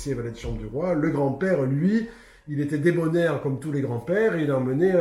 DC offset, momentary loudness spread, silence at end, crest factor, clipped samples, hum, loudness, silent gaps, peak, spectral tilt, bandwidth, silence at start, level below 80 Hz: under 0.1%; 9 LU; 0 s; 14 dB; under 0.1%; none; -24 LUFS; none; -10 dBFS; -8 dB/octave; 12.5 kHz; 0 s; -46 dBFS